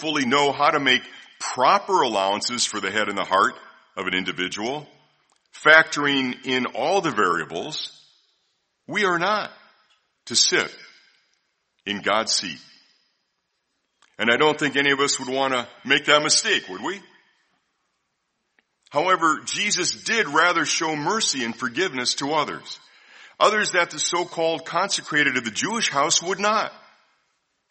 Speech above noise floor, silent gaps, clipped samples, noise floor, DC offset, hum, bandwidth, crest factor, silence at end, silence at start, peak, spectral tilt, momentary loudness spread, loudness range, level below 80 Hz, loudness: 53 dB; none; under 0.1%; -75 dBFS; under 0.1%; none; 8.8 kHz; 24 dB; 0.95 s; 0 s; 0 dBFS; -1.5 dB/octave; 12 LU; 4 LU; -70 dBFS; -21 LUFS